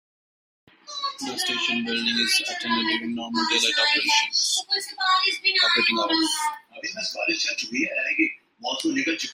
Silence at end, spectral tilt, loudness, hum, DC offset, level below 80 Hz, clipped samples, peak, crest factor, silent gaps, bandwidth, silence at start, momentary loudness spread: 0 s; -0.5 dB/octave; -22 LUFS; none; under 0.1%; -72 dBFS; under 0.1%; -8 dBFS; 18 dB; none; 16 kHz; 0.85 s; 10 LU